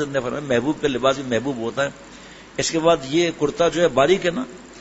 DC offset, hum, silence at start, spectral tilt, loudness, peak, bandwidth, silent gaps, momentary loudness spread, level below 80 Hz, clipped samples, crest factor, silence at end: under 0.1%; none; 0 s; -4.5 dB/octave; -21 LUFS; -2 dBFS; 8 kHz; none; 14 LU; -50 dBFS; under 0.1%; 18 dB; 0 s